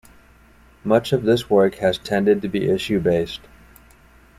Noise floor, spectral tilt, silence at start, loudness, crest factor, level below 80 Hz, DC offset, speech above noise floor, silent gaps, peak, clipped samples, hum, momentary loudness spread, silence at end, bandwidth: -51 dBFS; -6.5 dB/octave; 0.85 s; -20 LUFS; 18 dB; -50 dBFS; under 0.1%; 32 dB; none; -4 dBFS; under 0.1%; none; 7 LU; 1 s; 15.5 kHz